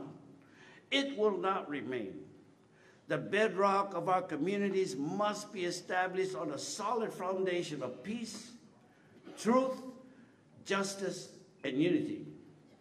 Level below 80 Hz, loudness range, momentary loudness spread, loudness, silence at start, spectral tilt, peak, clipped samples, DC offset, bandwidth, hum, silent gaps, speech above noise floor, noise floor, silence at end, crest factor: -84 dBFS; 4 LU; 15 LU; -35 LUFS; 0 s; -4.5 dB/octave; -16 dBFS; under 0.1%; under 0.1%; 13.5 kHz; none; none; 29 dB; -63 dBFS; 0.3 s; 20 dB